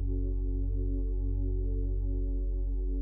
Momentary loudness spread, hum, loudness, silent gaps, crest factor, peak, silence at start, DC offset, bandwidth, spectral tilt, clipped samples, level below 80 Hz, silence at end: 1 LU; none; -34 LUFS; none; 8 dB; -22 dBFS; 0 s; under 0.1%; 0.9 kHz; -16 dB/octave; under 0.1%; -30 dBFS; 0 s